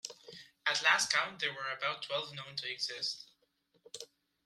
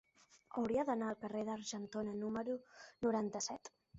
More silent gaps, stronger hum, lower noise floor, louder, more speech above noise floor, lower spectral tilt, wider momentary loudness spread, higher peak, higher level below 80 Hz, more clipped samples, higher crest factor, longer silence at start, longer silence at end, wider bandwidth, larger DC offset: neither; neither; first, -75 dBFS vs -66 dBFS; first, -33 LUFS vs -41 LUFS; first, 40 dB vs 25 dB; second, 0 dB/octave vs -5 dB/octave; first, 22 LU vs 9 LU; first, -12 dBFS vs -26 dBFS; second, -84 dBFS vs -74 dBFS; neither; first, 26 dB vs 16 dB; second, 0.05 s vs 0.35 s; first, 0.4 s vs 0 s; first, 15.5 kHz vs 8 kHz; neither